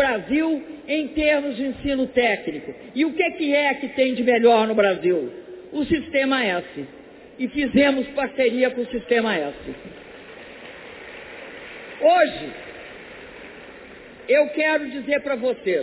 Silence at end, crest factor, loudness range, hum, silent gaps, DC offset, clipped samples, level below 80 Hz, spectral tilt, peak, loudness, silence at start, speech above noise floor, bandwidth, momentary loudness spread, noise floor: 0 s; 18 dB; 5 LU; none; none; under 0.1%; under 0.1%; -52 dBFS; -8.5 dB/octave; -4 dBFS; -21 LUFS; 0 s; 21 dB; 4 kHz; 21 LU; -42 dBFS